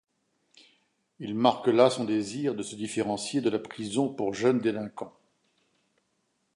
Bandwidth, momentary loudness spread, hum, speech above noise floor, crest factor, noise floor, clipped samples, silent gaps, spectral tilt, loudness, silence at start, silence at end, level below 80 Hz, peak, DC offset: 11.5 kHz; 13 LU; none; 48 dB; 22 dB; -75 dBFS; under 0.1%; none; -5 dB/octave; -28 LUFS; 1.2 s; 1.45 s; -72 dBFS; -8 dBFS; under 0.1%